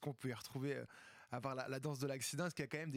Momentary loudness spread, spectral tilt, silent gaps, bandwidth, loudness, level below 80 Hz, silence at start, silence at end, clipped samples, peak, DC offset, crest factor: 7 LU; -5 dB/octave; none; 16.5 kHz; -44 LUFS; -80 dBFS; 0 s; 0 s; under 0.1%; -28 dBFS; under 0.1%; 16 dB